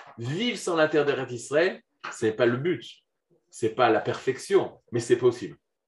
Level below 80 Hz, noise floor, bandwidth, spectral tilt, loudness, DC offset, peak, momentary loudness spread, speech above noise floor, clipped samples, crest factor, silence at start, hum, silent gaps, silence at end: -74 dBFS; -66 dBFS; 12 kHz; -5 dB/octave; -26 LUFS; under 0.1%; -8 dBFS; 11 LU; 40 dB; under 0.1%; 20 dB; 0 s; none; none; 0.35 s